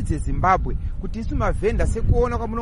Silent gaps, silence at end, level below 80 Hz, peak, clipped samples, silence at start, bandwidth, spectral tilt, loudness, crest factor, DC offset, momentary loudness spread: none; 0 s; -24 dBFS; -4 dBFS; under 0.1%; 0 s; 11 kHz; -7.5 dB/octave; -23 LUFS; 18 dB; under 0.1%; 10 LU